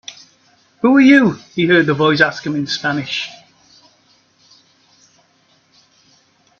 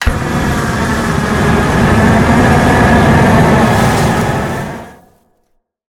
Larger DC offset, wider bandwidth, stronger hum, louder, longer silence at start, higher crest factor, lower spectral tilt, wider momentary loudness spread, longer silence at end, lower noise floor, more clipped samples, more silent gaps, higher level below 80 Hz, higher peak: neither; second, 7.2 kHz vs 18 kHz; neither; second, -14 LUFS vs -10 LUFS; about the same, 0.1 s vs 0 s; first, 18 dB vs 10 dB; about the same, -5.5 dB/octave vs -6 dB/octave; first, 13 LU vs 8 LU; first, 3.25 s vs 1 s; about the same, -57 dBFS vs -60 dBFS; neither; neither; second, -60 dBFS vs -22 dBFS; about the same, 0 dBFS vs 0 dBFS